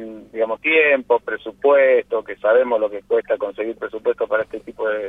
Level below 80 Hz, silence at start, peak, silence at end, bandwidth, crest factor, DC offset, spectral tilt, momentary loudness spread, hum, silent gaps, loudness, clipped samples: -60 dBFS; 0 s; -4 dBFS; 0 s; 3.9 kHz; 16 dB; under 0.1%; -5.5 dB/octave; 11 LU; none; none; -19 LUFS; under 0.1%